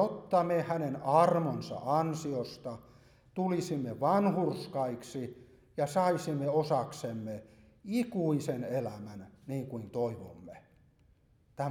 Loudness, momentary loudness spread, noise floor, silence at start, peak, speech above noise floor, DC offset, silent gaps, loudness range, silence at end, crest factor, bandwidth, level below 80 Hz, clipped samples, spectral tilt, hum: -32 LUFS; 16 LU; -66 dBFS; 0 s; -12 dBFS; 34 dB; under 0.1%; none; 5 LU; 0 s; 20 dB; 18 kHz; -68 dBFS; under 0.1%; -7 dB/octave; none